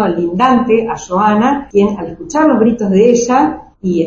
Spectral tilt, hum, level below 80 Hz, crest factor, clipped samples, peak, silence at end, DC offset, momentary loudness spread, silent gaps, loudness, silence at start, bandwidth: -6 dB/octave; none; -42 dBFS; 12 dB; under 0.1%; 0 dBFS; 0 s; under 0.1%; 8 LU; none; -12 LUFS; 0 s; 7.6 kHz